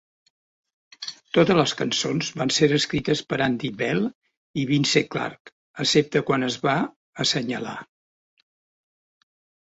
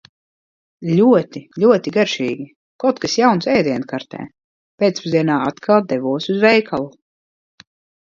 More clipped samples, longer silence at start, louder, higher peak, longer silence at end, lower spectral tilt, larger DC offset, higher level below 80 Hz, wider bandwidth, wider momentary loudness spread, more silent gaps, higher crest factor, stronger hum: neither; first, 1 s vs 0.8 s; second, -23 LUFS vs -17 LUFS; second, -4 dBFS vs 0 dBFS; first, 1.85 s vs 1.1 s; about the same, -4.5 dB/octave vs -5.5 dB/octave; neither; about the same, -58 dBFS vs -60 dBFS; about the same, 8.2 kHz vs 7.6 kHz; second, 13 LU vs 16 LU; first, 4.15-4.21 s, 4.37-4.54 s, 5.40-5.45 s, 5.52-5.74 s, 6.96-7.13 s vs 2.56-2.79 s, 4.44-4.78 s; about the same, 20 dB vs 18 dB; neither